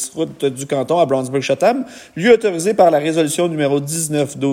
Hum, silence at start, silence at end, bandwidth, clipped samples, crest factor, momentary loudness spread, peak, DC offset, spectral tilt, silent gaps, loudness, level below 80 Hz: none; 0 s; 0 s; 16.5 kHz; under 0.1%; 16 dB; 8 LU; 0 dBFS; under 0.1%; -4.5 dB/octave; none; -16 LUFS; -60 dBFS